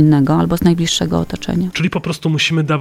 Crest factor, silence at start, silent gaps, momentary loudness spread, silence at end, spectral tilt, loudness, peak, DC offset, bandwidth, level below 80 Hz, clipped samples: 14 dB; 0 s; none; 6 LU; 0 s; -5.5 dB/octave; -16 LUFS; 0 dBFS; under 0.1%; 15 kHz; -38 dBFS; under 0.1%